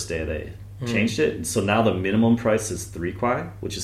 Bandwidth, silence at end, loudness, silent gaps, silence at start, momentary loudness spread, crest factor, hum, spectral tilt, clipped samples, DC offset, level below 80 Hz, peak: 14.5 kHz; 0 s; -23 LUFS; none; 0 s; 11 LU; 16 dB; none; -5 dB/octave; under 0.1%; under 0.1%; -44 dBFS; -6 dBFS